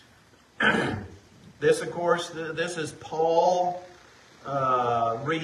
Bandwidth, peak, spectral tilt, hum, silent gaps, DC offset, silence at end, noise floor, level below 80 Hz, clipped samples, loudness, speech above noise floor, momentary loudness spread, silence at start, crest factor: 12.5 kHz; -10 dBFS; -4.5 dB/octave; none; none; under 0.1%; 0 s; -57 dBFS; -60 dBFS; under 0.1%; -26 LUFS; 31 dB; 11 LU; 0.6 s; 18 dB